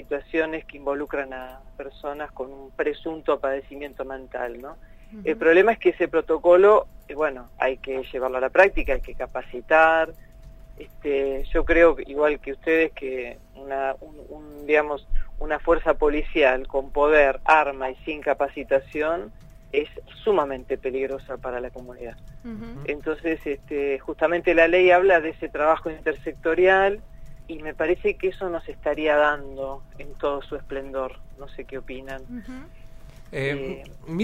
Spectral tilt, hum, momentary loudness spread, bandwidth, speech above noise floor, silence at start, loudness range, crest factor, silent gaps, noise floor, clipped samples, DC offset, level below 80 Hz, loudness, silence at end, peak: -6.5 dB/octave; none; 20 LU; 14.5 kHz; 21 dB; 0 s; 10 LU; 22 dB; none; -44 dBFS; under 0.1%; under 0.1%; -38 dBFS; -23 LUFS; 0 s; 0 dBFS